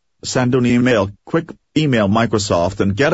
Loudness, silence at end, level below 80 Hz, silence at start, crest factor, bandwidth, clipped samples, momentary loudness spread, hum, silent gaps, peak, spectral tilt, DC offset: -17 LUFS; 0 s; -44 dBFS; 0.25 s; 14 dB; 8 kHz; under 0.1%; 8 LU; none; none; -4 dBFS; -5.5 dB/octave; under 0.1%